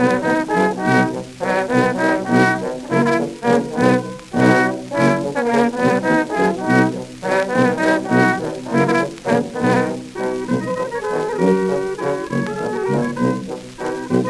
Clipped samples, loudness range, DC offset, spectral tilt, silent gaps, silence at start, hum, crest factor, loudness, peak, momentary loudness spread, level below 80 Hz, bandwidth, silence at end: under 0.1%; 3 LU; under 0.1%; -6.5 dB/octave; none; 0 s; none; 16 dB; -18 LUFS; 0 dBFS; 7 LU; -52 dBFS; 12.5 kHz; 0 s